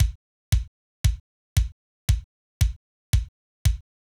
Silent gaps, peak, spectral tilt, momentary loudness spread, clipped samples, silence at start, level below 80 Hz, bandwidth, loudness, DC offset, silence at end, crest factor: 0.15-0.52 s, 0.68-1.04 s, 1.20-1.56 s, 1.72-2.08 s, 2.24-2.61 s, 2.76-3.13 s, 3.28-3.65 s; -10 dBFS; -4.5 dB/octave; 13 LU; under 0.1%; 0 s; -28 dBFS; 19 kHz; -28 LUFS; under 0.1%; 0.4 s; 16 dB